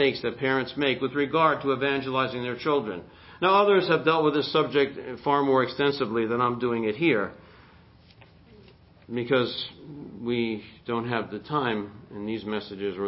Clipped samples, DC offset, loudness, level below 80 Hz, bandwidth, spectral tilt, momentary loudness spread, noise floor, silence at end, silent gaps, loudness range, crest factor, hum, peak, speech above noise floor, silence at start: under 0.1%; under 0.1%; -26 LUFS; -60 dBFS; 5.8 kHz; -10 dB/octave; 12 LU; -54 dBFS; 0 s; none; 7 LU; 18 dB; none; -8 dBFS; 28 dB; 0 s